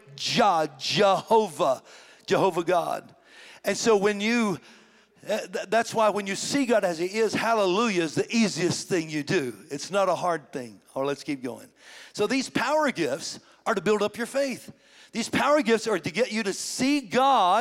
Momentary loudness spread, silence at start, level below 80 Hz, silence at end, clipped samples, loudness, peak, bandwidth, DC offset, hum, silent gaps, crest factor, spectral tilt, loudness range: 12 LU; 0.1 s; -68 dBFS; 0 s; under 0.1%; -25 LUFS; -10 dBFS; 16.5 kHz; under 0.1%; none; none; 16 dB; -4 dB/octave; 4 LU